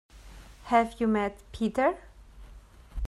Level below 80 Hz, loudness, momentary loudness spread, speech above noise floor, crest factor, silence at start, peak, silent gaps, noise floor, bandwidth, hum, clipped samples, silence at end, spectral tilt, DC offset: -44 dBFS; -28 LUFS; 18 LU; 23 dB; 20 dB; 0.15 s; -10 dBFS; none; -50 dBFS; 12 kHz; none; under 0.1%; 0 s; -6.5 dB/octave; under 0.1%